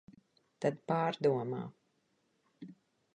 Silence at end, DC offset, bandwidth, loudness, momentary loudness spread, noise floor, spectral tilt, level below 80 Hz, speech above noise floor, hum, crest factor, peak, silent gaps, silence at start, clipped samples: 0.4 s; under 0.1%; 9.8 kHz; -35 LUFS; 23 LU; -77 dBFS; -7.5 dB/octave; -82 dBFS; 44 dB; none; 20 dB; -18 dBFS; none; 0.6 s; under 0.1%